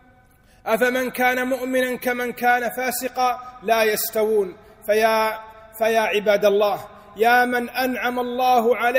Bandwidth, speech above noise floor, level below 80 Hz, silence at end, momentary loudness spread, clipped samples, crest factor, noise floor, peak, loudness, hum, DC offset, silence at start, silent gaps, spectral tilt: 16 kHz; 33 dB; -58 dBFS; 0 s; 7 LU; under 0.1%; 16 dB; -54 dBFS; -6 dBFS; -21 LUFS; none; under 0.1%; 0.65 s; none; -3 dB/octave